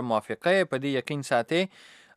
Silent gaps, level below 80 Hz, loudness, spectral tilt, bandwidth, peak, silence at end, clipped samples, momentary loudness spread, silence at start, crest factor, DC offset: none; -78 dBFS; -27 LUFS; -5 dB/octave; 14 kHz; -10 dBFS; 0.5 s; under 0.1%; 5 LU; 0 s; 18 dB; under 0.1%